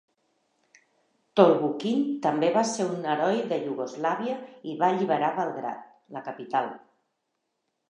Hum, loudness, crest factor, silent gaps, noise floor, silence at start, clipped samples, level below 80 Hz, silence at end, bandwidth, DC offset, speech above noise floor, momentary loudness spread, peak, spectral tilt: none; -26 LUFS; 24 dB; none; -79 dBFS; 1.35 s; under 0.1%; -84 dBFS; 1.15 s; 10.5 kHz; under 0.1%; 53 dB; 16 LU; -4 dBFS; -5.5 dB/octave